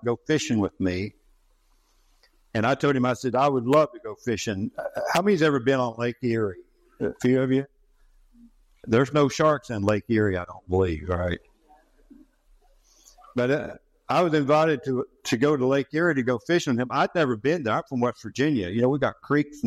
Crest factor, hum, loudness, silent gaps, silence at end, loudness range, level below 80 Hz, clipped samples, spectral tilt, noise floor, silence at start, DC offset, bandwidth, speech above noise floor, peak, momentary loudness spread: 18 dB; none; -24 LUFS; none; 0 s; 5 LU; -56 dBFS; under 0.1%; -6 dB/octave; -63 dBFS; 0 s; under 0.1%; 15.5 kHz; 39 dB; -8 dBFS; 10 LU